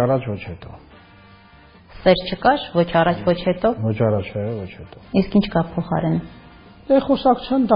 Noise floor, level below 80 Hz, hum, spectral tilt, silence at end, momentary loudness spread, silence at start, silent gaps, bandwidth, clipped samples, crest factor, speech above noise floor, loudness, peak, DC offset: -47 dBFS; -44 dBFS; none; -5.5 dB/octave; 0 s; 13 LU; 0 s; none; 5.2 kHz; under 0.1%; 18 dB; 28 dB; -20 LUFS; -2 dBFS; under 0.1%